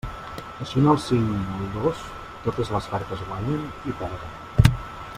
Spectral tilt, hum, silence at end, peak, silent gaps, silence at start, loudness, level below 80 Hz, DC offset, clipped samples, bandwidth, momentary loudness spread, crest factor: -7 dB/octave; none; 0 s; -2 dBFS; none; 0.05 s; -25 LUFS; -38 dBFS; under 0.1%; under 0.1%; 16 kHz; 15 LU; 24 dB